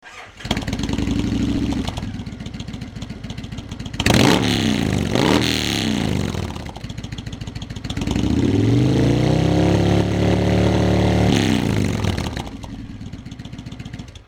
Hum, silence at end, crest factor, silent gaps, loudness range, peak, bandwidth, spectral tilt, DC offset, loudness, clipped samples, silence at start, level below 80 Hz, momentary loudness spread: none; 0.1 s; 16 dB; none; 7 LU; -4 dBFS; 17.5 kHz; -5.5 dB/octave; under 0.1%; -19 LUFS; under 0.1%; 0.05 s; -32 dBFS; 17 LU